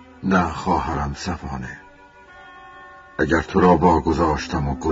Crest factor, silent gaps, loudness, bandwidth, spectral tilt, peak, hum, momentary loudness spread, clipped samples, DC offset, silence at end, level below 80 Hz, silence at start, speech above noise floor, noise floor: 20 dB; none; -20 LUFS; 7.8 kHz; -6.5 dB/octave; -2 dBFS; none; 20 LU; under 0.1%; under 0.1%; 0 s; -36 dBFS; 0 s; 27 dB; -46 dBFS